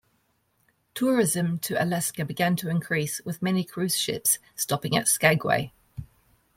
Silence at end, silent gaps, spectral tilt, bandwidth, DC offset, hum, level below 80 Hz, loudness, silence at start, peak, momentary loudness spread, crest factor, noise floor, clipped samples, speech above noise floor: 0.5 s; none; -4 dB/octave; 16.5 kHz; under 0.1%; none; -60 dBFS; -25 LUFS; 0.95 s; -4 dBFS; 9 LU; 22 dB; -70 dBFS; under 0.1%; 44 dB